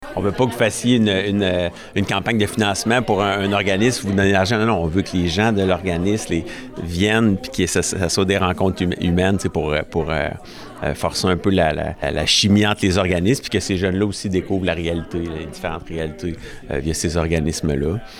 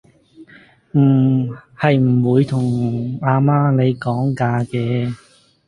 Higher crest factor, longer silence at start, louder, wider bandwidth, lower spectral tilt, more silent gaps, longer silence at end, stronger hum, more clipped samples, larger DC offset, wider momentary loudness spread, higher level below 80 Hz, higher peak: about the same, 14 dB vs 16 dB; second, 0 s vs 0.4 s; about the same, -19 LUFS vs -17 LUFS; first, 16 kHz vs 10 kHz; second, -5 dB/octave vs -9 dB/octave; neither; second, 0 s vs 0.5 s; neither; neither; neither; first, 10 LU vs 7 LU; first, -40 dBFS vs -54 dBFS; second, -4 dBFS vs 0 dBFS